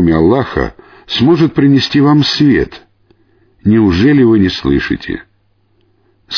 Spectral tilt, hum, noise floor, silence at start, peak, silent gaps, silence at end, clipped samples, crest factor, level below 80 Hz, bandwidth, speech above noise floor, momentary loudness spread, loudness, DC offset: -7 dB/octave; none; -56 dBFS; 0 s; 0 dBFS; none; 0 s; under 0.1%; 12 dB; -34 dBFS; 5.4 kHz; 46 dB; 11 LU; -11 LUFS; under 0.1%